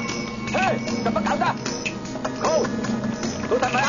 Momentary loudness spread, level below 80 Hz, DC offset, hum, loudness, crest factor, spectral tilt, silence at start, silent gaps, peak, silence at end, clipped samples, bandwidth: 6 LU; -48 dBFS; under 0.1%; none; -24 LUFS; 16 dB; -4.5 dB/octave; 0 s; none; -8 dBFS; 0 s; under 0.1%; 7.4 kHz